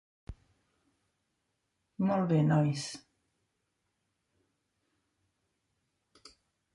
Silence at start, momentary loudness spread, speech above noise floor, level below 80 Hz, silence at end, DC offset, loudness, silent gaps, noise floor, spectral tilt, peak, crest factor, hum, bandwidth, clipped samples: 0.3 s; 25 LU; 53 dB; -64 dBFS; 3.75 s; under 0.1%; -30 LUFS; none; -81 dBFS; -7 dB/octave; -16 dBFS; 20 dB; none; 11.5 kHz; under 0.1%